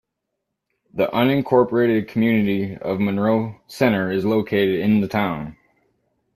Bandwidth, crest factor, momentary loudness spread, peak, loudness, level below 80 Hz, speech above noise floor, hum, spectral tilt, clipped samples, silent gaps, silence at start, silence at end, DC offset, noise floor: 14.5 kHz; 18 dB; 8 LU; -2 dBFS; -20 LUFS; -56 dBFS; 59 dB; none; -7.5 dB/octave; under 0.1%; none; 0.95 s; 0.8 s; under 0.1%; -79 dBFS